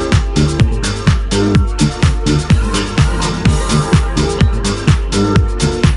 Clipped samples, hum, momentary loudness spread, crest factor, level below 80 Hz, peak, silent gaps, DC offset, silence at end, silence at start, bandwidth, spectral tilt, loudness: under 0.1%; none; 2 LU; 12 dB; -18 dBFS; 0 dBFS; none; under 0.1%; 0 s; 0 s; 11.5 kHz; -5.5 dB/octave; -14 LUFS